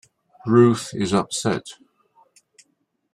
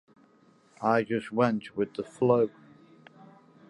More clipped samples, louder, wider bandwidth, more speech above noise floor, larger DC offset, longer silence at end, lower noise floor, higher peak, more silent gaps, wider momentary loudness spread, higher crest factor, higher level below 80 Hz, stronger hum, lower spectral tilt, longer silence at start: neither; first, -20 LUFS vs -28 LUFS; first, 13 kHz vs 11.5 kHz; first, 50 dB vs 35 dB; neither; first, 1.4 s vs 1.2 s; first, -69 dBFS vs -61 dBFS; first, -2 dBFS vs -10 dBFS; neither; first, 16 LU vs 8 LU; about the same, 20 dB vs 20 dB; first, -60 dBFS vs -72 dBFS; neither; second, -5.5 dB/octave vs -7.5 dB/octave; second, 0.45 s vs 0.8 s